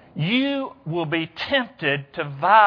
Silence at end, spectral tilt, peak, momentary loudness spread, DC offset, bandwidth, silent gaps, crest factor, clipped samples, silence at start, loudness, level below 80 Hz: 0 s; -7.5 dB/octave; -2 dBFS; 7 LU; under 0.1%; 5.4 kHz; none; 20 dB; under 0.1%; 0.15 s; -23 LUFS; -62 dBFS